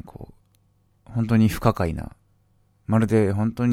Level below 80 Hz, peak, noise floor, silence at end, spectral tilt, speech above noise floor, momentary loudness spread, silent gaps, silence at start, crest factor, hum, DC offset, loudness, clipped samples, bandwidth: -42 dBFS; -2 dBFS; -63 dBFS; 0 s; -8 dB/octave; 42 dB; 21 LU; none; 0.05 s; 22 dB; none; under 0.1%; -22 LUFS; under 0.1%; 15.5 kHz